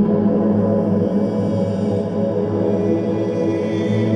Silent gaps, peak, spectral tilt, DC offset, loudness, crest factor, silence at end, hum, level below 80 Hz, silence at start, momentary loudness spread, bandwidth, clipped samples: none; -6 dBFS; -9.5 dB/octave; under 0.1%; -19 LUFS; 12 dB; 0 s; none; -52 dBFS; 0 s; 4 LU; 8.8 kHz; under 0.1%